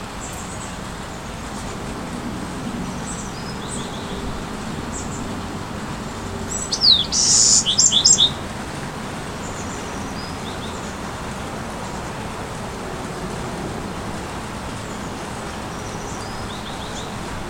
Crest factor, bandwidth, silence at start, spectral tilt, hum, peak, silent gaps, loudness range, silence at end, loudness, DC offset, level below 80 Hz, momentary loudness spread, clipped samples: 24 dB; 17 kHz; 0 s; -2 dB/octave; none; 0 dBFS; none; 14 LU; 0 s; -21 LUFS; under 0.1%; -40 dBFS; 17 LU; under 0.1%